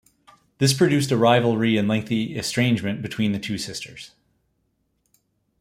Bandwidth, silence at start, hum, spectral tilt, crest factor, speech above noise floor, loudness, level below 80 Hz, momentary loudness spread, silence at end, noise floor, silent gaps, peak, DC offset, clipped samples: 16 kHz; 0.6 s; none; -5 dB/octave; 20 dB; 49 dB; -21 LUFS; -58 dBFS; 12 LU; 1.55 s; -71 dBFS; none; -4 dBFS; under 0.1%; under 0.1%